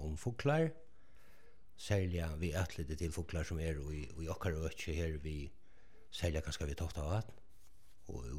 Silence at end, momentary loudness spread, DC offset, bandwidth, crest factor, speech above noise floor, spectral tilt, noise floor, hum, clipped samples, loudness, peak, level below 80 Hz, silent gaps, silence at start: 0 s; 13 LU; 0.3%; 15.5 kHz; 20 dB; 28 dB; -6 dB/octave; -67 dBFS; none; under 0.1%; -40 LUFS; -22 dBFS; -50 dBFS; none; 0 s